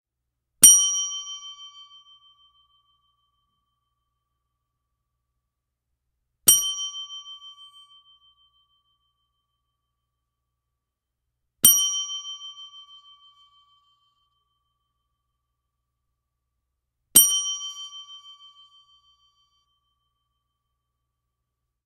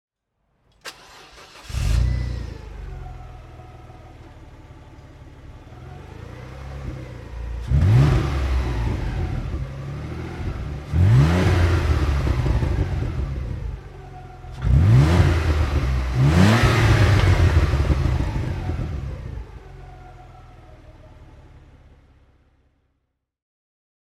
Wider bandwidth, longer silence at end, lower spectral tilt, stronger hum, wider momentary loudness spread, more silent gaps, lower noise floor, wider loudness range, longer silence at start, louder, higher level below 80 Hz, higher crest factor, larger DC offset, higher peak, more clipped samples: about the same, 13.5 kHz vs 13 kHz; first, 3.7 s vs 2.65 s; second, 1.5 dB/octave vs -7 dB/octave; neither; first, 28 LU vs 24 LU; neither; first, -83 dBFS vs -74 dBFS; second, 18 LU vs 21 LU; second, 0.6 s vs 0.85 s; first, -17 LUFS vs -21 LUFS; second, -64 dBFS vs -28 dBFS; first, 28 dB vs 18 dB; neither; about the same, 0 dBFS vs -2 dBFS; neither